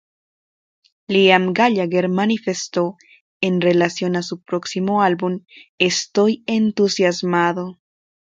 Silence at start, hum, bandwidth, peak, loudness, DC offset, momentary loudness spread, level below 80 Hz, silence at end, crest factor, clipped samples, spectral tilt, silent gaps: 1.1 s; none; 9.2 kHz; 0 dBFS; -18 LUFS; under 0.1%; 10 LU; -64 dBFS; 0.55 s; 18 dB; under 0.1%; -5 dB/octave; 3.20-3.40 s, 5.69-5.78 s